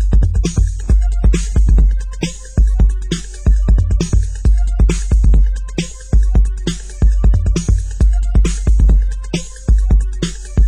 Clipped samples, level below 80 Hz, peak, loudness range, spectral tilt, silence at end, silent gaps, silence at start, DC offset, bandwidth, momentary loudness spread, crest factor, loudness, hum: under 0.1%; -12 dBFS; -2 dBFS; 1 LU; -6 dB/octave; 0 s; none; 0 s; under 0.1%; 9.8 kHz; 8 LU; 10 dB; -16 LUFS; none